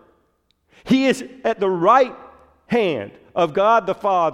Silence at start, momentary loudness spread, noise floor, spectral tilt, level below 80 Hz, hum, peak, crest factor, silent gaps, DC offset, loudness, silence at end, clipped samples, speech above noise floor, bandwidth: 0.85 s; 8 LU; -65 dBFS; -5.5 dB/octave; -60 dBFS; none; -2 dBFS; 16 dB; none; under 0.1%; -19 LUFS; 0 s; under 0.1%; 47 dB; 14 kHz